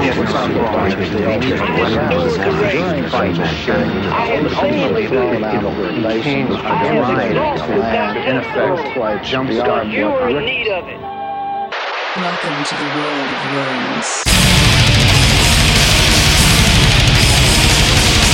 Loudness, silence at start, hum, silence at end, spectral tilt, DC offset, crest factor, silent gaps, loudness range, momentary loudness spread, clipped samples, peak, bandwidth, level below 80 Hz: -14 LUFS; 0 s; none; 0 s; -4 dB/octave; under 0.1%; 14 dB; none; 9 LU; 9 LU; under 0.1%; 0 dBFS; 16.5 kHz; -24 dBFS